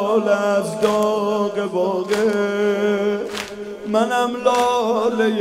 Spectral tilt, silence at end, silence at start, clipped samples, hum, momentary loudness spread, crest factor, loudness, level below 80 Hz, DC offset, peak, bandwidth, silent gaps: -5 dB/octave; 0 s; 0 s; under 0.1%; none; 5 LU; 16 dB; -19 LUFS; -58 dBFS; under 0.1%; -4 dBFS; 15.5 kHz; none